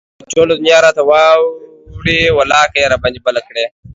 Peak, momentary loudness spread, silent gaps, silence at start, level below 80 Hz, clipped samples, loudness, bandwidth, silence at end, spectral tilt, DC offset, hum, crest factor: 0 dBFS; 10 LU; none; 0.3 s; -38 dBFS; under 0.1%; -11 LUFS; 7.8 kHz; 0.25 s; -3.5 dB/octave; under 0.1%; none; 12 dB